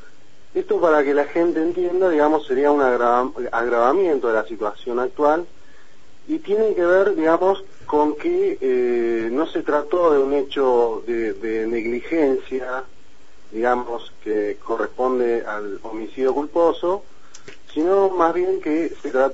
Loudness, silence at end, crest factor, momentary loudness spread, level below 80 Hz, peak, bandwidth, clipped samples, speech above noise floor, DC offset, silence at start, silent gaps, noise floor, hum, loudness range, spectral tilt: -20 LUFS; 0 s; 18 dB; 10 LU; -54 dBFS; -2 dBFS; 8 kHz; under 0.1%; 33 dB; 2%; 0.55 s; none; -53 dBFS; none; 5 LU; -6 dB/octave